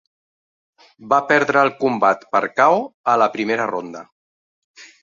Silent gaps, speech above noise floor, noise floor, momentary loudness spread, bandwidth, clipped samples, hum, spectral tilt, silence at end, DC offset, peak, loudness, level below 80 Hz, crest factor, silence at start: 2.94-3.04 s, 4.12-4.74 s; over 72 dB; under -90 dBFS; 9 LU; 7.6 kHz; under 0.1%; none; -5 dB/octave; 0.2 s; under 0.1%; -2 dBFS; -18 LUFS; -68 dBFS; 18 dB; 1 s